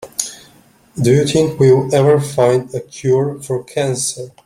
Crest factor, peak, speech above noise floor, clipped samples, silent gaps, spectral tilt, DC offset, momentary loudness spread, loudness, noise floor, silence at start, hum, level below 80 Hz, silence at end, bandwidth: 16 dB; 0 dBFS; 34 dB; under 0.1%; none; -5.5 dB/octave; under 0.1%; 11 LU; -15 LUFS; -49 dBFS; 0 s; none; -50 dBFS; 0.15 s; 15.5 kHz